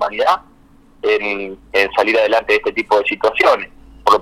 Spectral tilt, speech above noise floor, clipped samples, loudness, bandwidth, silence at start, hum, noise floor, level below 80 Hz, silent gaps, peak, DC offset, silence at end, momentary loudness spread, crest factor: -3.5 dB/octave; 31 dB; under 0.1%; -16 LUFS; 16 kHz; 0 s; none; -47 dBFS; -48 dBFS; none; 0 dBFS; under 0.1%; 0 s; 8 LU; 16 dB